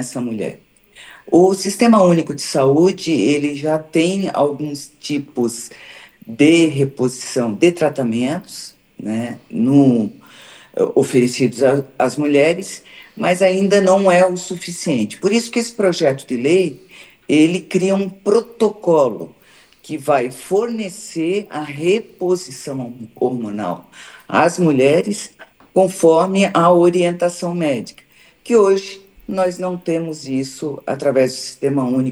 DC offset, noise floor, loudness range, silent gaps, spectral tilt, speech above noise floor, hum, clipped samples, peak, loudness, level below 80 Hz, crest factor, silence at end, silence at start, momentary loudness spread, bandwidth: under 0.1%; -49 dBFS; 5 LU; none; -5.5 dB/octave; 32 dB; none; under 0.1%; 0 dBFS; -17 LUFS; -62 dBFS; 16 dB; 0 s; 0 s; 13 LU; 14.5 kHz